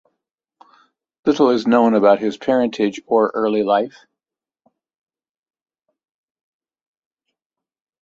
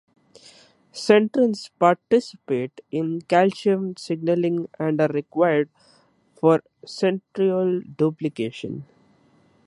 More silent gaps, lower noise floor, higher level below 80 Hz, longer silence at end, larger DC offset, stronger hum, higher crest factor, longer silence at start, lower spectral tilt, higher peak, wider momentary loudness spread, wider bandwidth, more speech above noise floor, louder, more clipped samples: neither; first, -89 dBFS vs -59 dBFS; about the same, -66 dBFS vs -70 dBFS; first, 4.15 s vs 0.8 s; neither; neither; about the same, 20 dB vs 20 dB; first, 1.25 s vs 0.95 s; about the same, -6 dB/octave vs -6.5 dB/octave; about the same, -2 dBFS vs -2 dBFS; second, 7 LU vs 11 LU; second, 7.6 kHz vs 11.5 kHz; first, 73 dB vs 37 dB; first, -17 LUFS vs -22 LUFS; neither